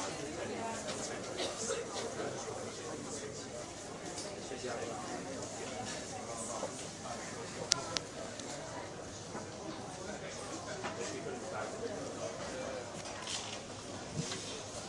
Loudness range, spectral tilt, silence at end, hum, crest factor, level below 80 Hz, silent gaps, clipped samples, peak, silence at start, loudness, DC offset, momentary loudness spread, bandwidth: 3 LU; -3 dB/octave; 0 s; none; 38 dB; -66 dBFS; none; under 0.1%; -4 dBFS; 0 s; -41 LUFS; under 0.1%; 6 LU; 11.5 kHz